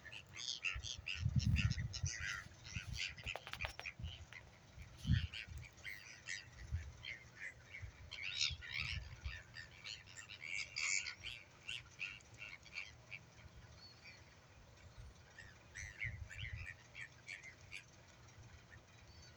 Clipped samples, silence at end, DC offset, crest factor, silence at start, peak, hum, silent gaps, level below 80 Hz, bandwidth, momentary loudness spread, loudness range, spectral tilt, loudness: under 0.1%; 0 s; under 0.1%; 26 dB; 0 s; -20 dBFS; none; none; -56 dBFS; over 20 kHz; 21 LU; 11 LU; -3 dB/octave; -45 LUFS